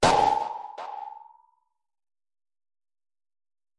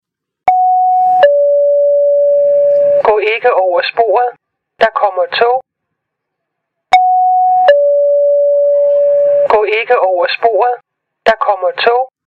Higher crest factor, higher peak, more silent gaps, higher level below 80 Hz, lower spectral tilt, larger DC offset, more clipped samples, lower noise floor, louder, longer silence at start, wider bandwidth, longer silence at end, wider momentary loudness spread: first, 24 dB vs 10 dB; second, -6 dBFS vs 0 dBFS; neither; about the same, -54 dBFS vs -56 dBFS; about the same, -3.5 dB/octave vs -3.5 dB/octave; neither; neither; about the same, -72 dBFS vs -74 dBFS; second, -27 LUFS vs -11 LUFS; second, 0 s vs 0.45 s; first, 11.5 kHz vs 7 kHz; first, 2.6 s vs 0.2 s; first, 21 LU vs 5 LU